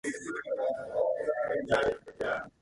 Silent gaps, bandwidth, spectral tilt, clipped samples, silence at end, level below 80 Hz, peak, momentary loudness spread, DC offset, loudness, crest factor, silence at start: none; 11.5 kHz; -4.5 dB/octave; under 0.1%; 0.1 s; -60 dBFS; -14 dBFS; 7 LU; under 0.1%; -32 LUFS; 18 dB; 0.05 s